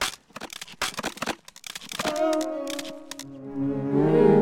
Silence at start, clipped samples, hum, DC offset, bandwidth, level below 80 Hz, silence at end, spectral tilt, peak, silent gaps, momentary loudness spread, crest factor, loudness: 0 s; under 0.1%; none; under 0.1%; 17 kHz; -60 dBFS; 0 s; -5 dB/octave; -6 dBFS; none; 16 LU; 20 dB; -27 LUFS